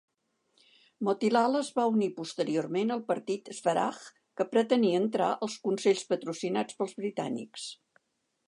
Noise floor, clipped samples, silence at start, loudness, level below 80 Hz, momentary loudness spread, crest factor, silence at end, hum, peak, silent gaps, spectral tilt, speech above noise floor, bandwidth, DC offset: -79 dBFS; under 0.1%; 1 s; -30 LUFS; -84 dBFS; 10 LU; 18 dB; 0.75 s; none; -12 dBFS; none; -5 dB/octave; 50 dB; 11.5 kHz; under 0.1%